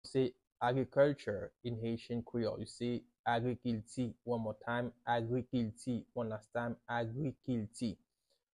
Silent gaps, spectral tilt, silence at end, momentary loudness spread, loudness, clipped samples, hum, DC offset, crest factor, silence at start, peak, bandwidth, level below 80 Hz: 0.47-0.51 s, 3.19-3.24 s; -7 dB/octave; 0.65 s; 8 LU; -38 LUFS; under 0.1%; none; under 0.1%; 20 dB; 0.05 s; -18 dBFS; 11 kHz; -66 dBFS